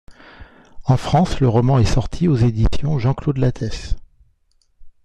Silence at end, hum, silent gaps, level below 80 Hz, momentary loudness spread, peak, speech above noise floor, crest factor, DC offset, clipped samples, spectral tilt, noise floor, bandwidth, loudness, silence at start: 0.15 s; none; none; -28 dBFS; 12 LU; -2 dBFS; 44 dB; 16 dB; under 0.1%; under 0.1%; -7.5 dB/octave; -60 dBFS; 9.6 kHz; -18 LUFS; 0.1 s